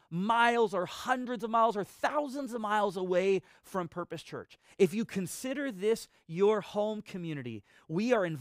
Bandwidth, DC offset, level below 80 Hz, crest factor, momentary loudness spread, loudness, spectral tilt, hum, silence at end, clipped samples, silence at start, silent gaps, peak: 15.5 kHz; under 0.1%; -72 dBFS; 20 dB; 12 LU; -31 LUFS; -5.5 dB/octave; none; 0 s; under 0.1%; 0.1 s; none; -12 dBFS